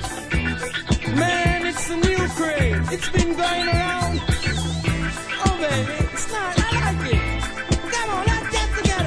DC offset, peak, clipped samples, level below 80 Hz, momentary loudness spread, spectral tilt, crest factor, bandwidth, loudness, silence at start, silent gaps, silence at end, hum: under 0.1%; -4 dBFS; under 0.1%; -28 dBFS; 4 LU; -4.5 dB/octave; 18 dB; 11 kHz; -22 LUFS; 0 s; none; 0 s; none